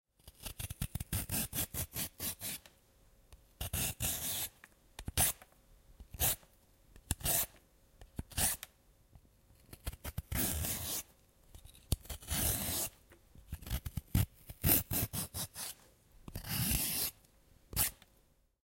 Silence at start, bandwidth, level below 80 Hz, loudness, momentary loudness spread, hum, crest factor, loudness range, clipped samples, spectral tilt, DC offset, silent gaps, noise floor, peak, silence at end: 0.25 s; 17 kHz; -50 dBFS; -36 LUFS; 16 LU; none; 28 dB; 5 LU; under 0.1%; -2.5 dB/octave; under 0.1%; none; -70 dBFS; -12 dBFS; 0.75 s